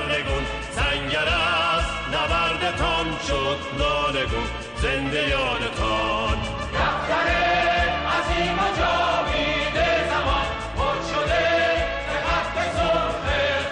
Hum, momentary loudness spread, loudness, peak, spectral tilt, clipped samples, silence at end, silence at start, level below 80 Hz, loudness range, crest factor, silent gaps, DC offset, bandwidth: none; 5 LU; -22 LUFS; -10 dBFS; -4.5 dB/octave; under 0.1%; 0 s; 0 s; -34 dBFS; 2 LU; 12 dB; none; under 0.1%; 10 kHz